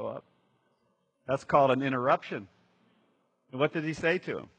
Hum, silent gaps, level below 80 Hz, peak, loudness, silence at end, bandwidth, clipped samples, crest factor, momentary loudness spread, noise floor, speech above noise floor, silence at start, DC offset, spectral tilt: none; none; -68 dBFS; -8 dBFS; -29 LUFS; 0.1 s; 9 kHz; under 0.1%; 22 dB; 18 LU; -74 dBFS; 46 dB; 0 s; under 0.1%; -6.5 dB/octave